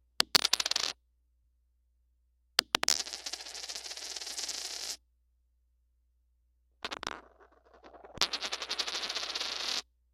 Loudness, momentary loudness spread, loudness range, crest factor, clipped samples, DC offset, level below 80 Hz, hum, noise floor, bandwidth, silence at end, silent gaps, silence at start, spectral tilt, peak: -32 LUFS; 14 LU; 11 LU; 34 dB; under 0.1%; under 0.1%; -66 dBFS; none; -72 dBFS; 16.5 kHz; 0.3 s; none; 0.2 s; 1 dB/octave; -2 dBFS